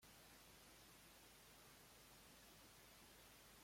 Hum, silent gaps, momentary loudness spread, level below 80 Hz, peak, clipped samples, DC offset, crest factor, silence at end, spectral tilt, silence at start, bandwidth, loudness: none; none; 0 LU; -78 dBFS; -54 dBFS; under 0.1%; under 0.1%; 12 dB; 0 s; -2 dB/octave; 0 s; 16.5 kHz; -65 LUFS